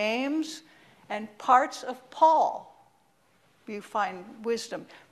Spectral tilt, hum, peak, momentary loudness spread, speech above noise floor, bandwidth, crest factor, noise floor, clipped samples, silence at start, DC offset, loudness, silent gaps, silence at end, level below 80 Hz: -3.5 dB/octave; none; -6 dBFS; 19 LU; 39 dB; 13.5 kHz; 22 dB; -66 dBFS; under 0.1%; 0 s; under 0.1%; -27 LUFS; none; 0.15 s; -78 dBFS